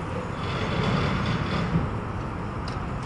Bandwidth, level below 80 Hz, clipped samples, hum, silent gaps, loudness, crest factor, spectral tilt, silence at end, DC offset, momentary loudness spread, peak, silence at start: 11 kHz; -38 dBFS; under 0.1%; none; none; -28 LUFS; 14 dB; -7 dB/octave; 0 s; under 0.1%; 7 LU; -12 dBFS; 0 s